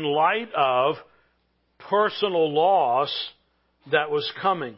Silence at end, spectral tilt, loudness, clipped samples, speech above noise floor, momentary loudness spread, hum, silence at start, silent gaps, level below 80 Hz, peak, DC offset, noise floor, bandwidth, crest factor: 0 s; -8.5 dB/octave; -23 LUFS; under 0.1%; 46 dB; 7 LU; none; 0 s; none; -72 dBFS; -6 dBFS; under 0.1%; -69 dBFS; 5.8 kHz; 18 dB